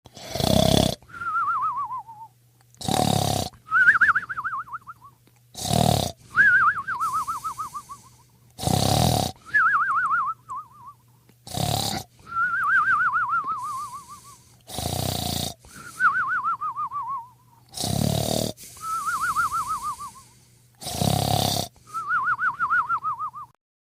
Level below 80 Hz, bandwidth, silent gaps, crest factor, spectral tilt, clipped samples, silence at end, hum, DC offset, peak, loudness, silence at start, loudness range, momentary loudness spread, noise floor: -46 dBFS; 16 kHz; none; 22 dB; -3.5 dB/octave; under 0.1%; 0.45 s; none; under 0.1%; -4 dBFS; -23 LUFS; 0.15 s; 5 LU; 16 LU; -57 dBFS